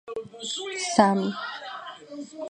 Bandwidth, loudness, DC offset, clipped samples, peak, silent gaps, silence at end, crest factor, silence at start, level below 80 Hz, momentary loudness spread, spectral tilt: 10 kHz; -26 LUFS; under 0.1%; under 0.1%; -4 dBFS; none; 0 s; 24 dB; 0.05 s; -66 dBFS; 19 LU; -4 dB/octave